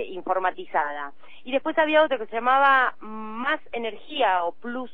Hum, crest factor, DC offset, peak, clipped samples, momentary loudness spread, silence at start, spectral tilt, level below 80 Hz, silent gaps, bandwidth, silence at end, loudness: none; 18 dB; 1%; -6 dBFS; under 0.1%; 16 LU; 0 s; -6 dB/octave; -66 dBFS; none; 5.2 kHz; 0.05 s; -23 LUFS